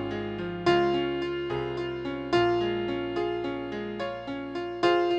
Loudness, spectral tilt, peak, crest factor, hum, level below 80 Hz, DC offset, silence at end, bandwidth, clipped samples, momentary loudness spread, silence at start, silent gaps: -29 LUFS; -6.5 dB/octave; -10 dBFS; 18 dB; none; -54 dBFS; under 0.1%; 0 s; 7.8 kHz; under 0.1%; 10 LU; 0 s; none